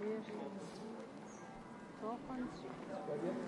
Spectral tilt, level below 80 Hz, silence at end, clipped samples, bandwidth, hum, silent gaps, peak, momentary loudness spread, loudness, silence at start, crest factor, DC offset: -6.5 dB/octave; -72 dBFS; 0 s; under 0.1%; 11.5 kHz; none; none; -30 dBFS; 10 LU; -47 LUFS; 0 s; 16 dB; under 0.1%